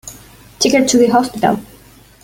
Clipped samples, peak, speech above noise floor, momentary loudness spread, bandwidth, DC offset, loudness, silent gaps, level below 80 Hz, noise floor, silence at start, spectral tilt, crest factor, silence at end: under 0.1%; 0 dBFS; 31 dB; 10 LU; 17 kHz; under 0.1%; -14 LUFS; none; -48 dBFS; -44 dBFS; 0.05 s; -3.5 dB/octave; 16 dB; 0.6 s